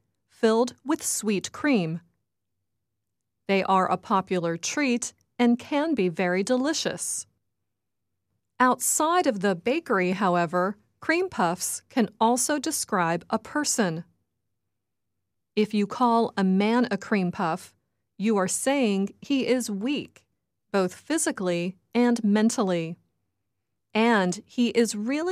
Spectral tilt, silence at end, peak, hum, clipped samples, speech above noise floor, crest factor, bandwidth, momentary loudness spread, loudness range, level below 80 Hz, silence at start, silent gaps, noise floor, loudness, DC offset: -4 dB/octave; 0 s; -6 dBFS; none; under 0.1%; 60 dB; 20 dB; 15 kHz; 7 LU; 3 LU; -72 dBFS; 0.4 s; none; -84 dBFS; -25 LUFS; under 0.1%